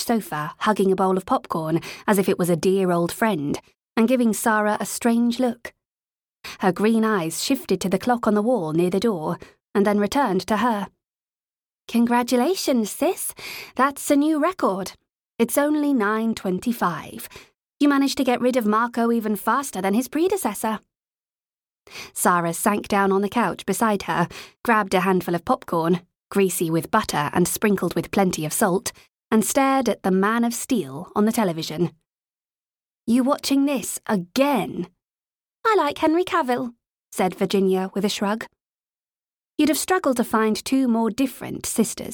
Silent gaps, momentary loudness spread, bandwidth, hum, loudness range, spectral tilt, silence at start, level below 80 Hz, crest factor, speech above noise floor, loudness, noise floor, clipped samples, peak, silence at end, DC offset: 11.08-11.12 s, 11.22-11.26 s, 21.53-21.57 s, 32.66-32.70 s; 8 LU; over 20 kHz; none; 3 LU; -5 dB/octave; 0 s; -58 dBFS; 18 dB; over 69 dB; -22 LUFS; under -90 dBFS; under 0.1%; -4 dBFS; 0 s; under 0.1%